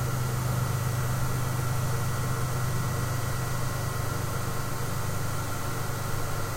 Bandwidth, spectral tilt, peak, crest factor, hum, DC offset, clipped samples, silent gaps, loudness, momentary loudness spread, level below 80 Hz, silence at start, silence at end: 16 kHz; -5 dB/octave; -16 dBFS; 12 dB; none; under 0.1%; under 0.1%; none; -30 LUFS; 3 LU; -40 dBFS; 0 s; 0 s